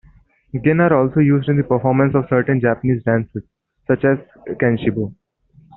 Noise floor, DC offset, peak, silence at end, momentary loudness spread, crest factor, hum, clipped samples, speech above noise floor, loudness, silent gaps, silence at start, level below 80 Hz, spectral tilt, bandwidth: -52 dBFS; under 0.1%; -2 dBFS; 0.65 s; 14 LU; 16 dB; none; under 0.1%; 36 dB; -17 LUFS; none; 0.55 s; -50 dBFS; -8 dB/octave; 4 kHz